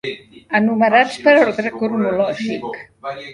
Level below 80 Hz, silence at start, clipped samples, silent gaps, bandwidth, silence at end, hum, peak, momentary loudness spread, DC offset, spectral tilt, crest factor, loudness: -60 dBFS; 0.05 s; under 0.1%; none; 11 kHz; 0 s; none; 0 dBFS; 17 LU; under 0.1%; -5.5 dB/octave; 18 dB; -16 LUFS